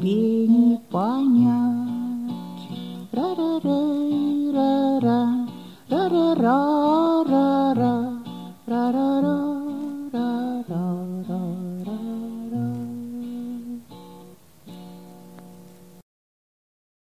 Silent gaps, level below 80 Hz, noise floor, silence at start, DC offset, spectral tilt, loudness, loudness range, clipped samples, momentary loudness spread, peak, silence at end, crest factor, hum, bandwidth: none; -66 dBFS; -48 dBFS; 0 s; 0.2%; -8 dB/octave; -23 LUFS; 13 LU; under 0.1%; 15 LU; -6 dBFS; 1.5 s; 16 dB; none; 14.5 kHz